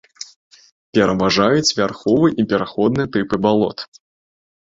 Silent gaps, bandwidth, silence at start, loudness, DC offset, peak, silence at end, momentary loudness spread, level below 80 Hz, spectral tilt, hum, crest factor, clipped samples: 0.36-0.51 s, 0.72-0.93 s; 8 kHz; 0.2 s; -17 LUFS; under 0.1%; -2 dBFS; 0.8 s; 19 LU; -50 dBFS; -5 dB/octave; none; 16 dB; under 0.1%